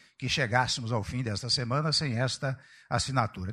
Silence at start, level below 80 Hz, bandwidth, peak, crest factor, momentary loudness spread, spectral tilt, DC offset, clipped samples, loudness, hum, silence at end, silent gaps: 0.2 s; -54 dBFS; 11.5 kHz; -10 dBFS; 20 dB; 7 LU; -4 dB/octave; under 0.1%; under 0.1%; -29 LUFS; none; 0 s; none